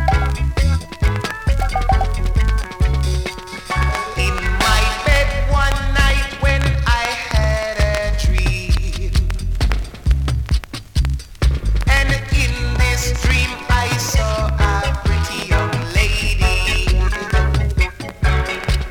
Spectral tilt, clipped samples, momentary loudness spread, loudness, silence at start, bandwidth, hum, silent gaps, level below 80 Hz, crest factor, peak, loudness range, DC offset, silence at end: -4.5 dB/octave; under 0.1%; 5 LU; -18 LUFS; 0 s; 17.5 kHz; none; none; -18 dBFS; 16 dB; 0 dBFS; 3 LU; under 0.1%; 0 s